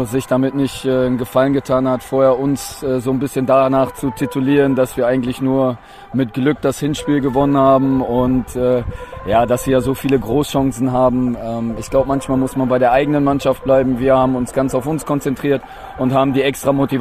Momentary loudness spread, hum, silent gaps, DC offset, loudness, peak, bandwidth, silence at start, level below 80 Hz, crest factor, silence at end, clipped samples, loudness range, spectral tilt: 7 LU; none; none; under 0.1%; -16 LUFS; -2 dBFS; 14.5 kHz; 0 s; -38 dBFS; 14 dB; 0 s; under 0.1%; 1 LU; -6.5 dB/octave